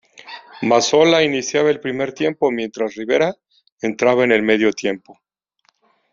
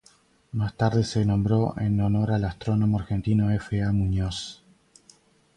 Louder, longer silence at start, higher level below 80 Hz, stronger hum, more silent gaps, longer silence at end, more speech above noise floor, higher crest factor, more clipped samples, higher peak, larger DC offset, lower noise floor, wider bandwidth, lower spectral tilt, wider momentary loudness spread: first, -17 LUFS vs -25 LUFS; second, 0.25 s vs 0.55 s; second, -60 dBFS vs -42 dBFS; neither; first, 3.72-3.77 s vs none; about the same, 1 s vs 1.05 s; first, 47 dB vs 36 dB; about the same, 18 dB vs 16 dB; neither; first, -2 dBFS vs -10 dBFS; neither; first, -64 dBFS vs -59 dBFS; second, 7.6 kHz vs 10.5 kHz; second, -3 dB/octave vs -7.5 dB/octave; first, 13 LU vs 7 LU